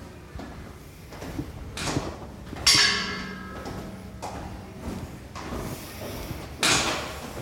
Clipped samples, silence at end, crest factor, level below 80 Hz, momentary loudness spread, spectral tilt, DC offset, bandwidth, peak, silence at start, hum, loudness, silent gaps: under 0.1%; 0 s; 26 dB; -44 dBFS; 21 LU; -2 dB/octave; under 0.1%; 17 kHz; -4 dBFS; 0 s; none; -26 LUFS; none